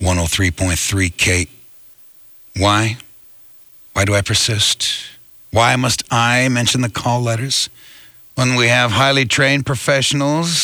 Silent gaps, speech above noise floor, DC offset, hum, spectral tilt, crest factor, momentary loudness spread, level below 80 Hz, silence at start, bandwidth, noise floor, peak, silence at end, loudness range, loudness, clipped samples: none; 28 dB; under 0.1%; none; -3.5 dB/octave; 16 dB; 8 LU; -38 dBFS; 0 s; over 20 kHz; -44 dBFS; 0 dBFS; 0 s; 4 LU; -15 LUFS; under 0.1%